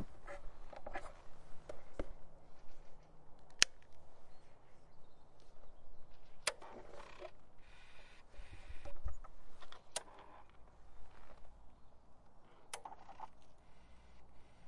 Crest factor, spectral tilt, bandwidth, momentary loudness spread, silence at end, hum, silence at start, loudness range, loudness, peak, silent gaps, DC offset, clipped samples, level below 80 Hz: 38 dB; -1 dB/octave; 11 kHz; 25 LU; 0 s; none; 0 s; 15 LU; -44 LUFS; -4 dBFS; none; under 0.1%; under 0.1%; -56 dBFS